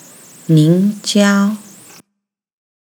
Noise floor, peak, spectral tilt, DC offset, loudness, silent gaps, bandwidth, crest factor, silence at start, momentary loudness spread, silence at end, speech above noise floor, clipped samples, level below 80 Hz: -75 dBFS; 0 dBFS; -6 dB/octave; under 0.1%; -13 LUFS; none; 20 kHz; 16 dB; 0.5 s; 14 LU; 1.25 s; 63 dB; under 0.1%; -78 dBFS